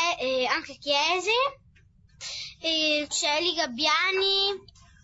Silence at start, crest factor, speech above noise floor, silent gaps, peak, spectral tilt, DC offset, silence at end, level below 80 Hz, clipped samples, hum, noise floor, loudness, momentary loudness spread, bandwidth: 0 s; 18 dB; 32 dB; none; -8 dBFS; -0.5 dB/octave; under 0.1%; 0.45 s; -62 dBFS; under 0.1%; none; -58 dBFS; -25 LUFS; 12 LU; 8.2 kHz